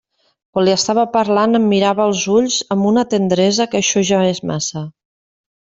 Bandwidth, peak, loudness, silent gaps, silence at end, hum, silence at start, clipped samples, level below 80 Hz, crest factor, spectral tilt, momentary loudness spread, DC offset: 7.8 kHz; -2 dBFS; -15 LUFS; none; 0.8 s; none; 0.55 s; under 0.1%; -56 dBFS; 14 dB; -4.5 dB/octave; 7 LU; under 0.1%